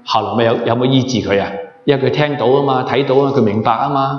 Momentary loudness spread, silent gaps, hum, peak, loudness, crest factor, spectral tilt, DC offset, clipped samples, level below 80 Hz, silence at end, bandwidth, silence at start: 4 LU; none; none; 0 dBFS; -15 LUFS; 14 dB; -6.5 dB/octave; under 0.1%; under 0.1%; -54 dBFS; 0 s; 7.2 kHz; 0.05 s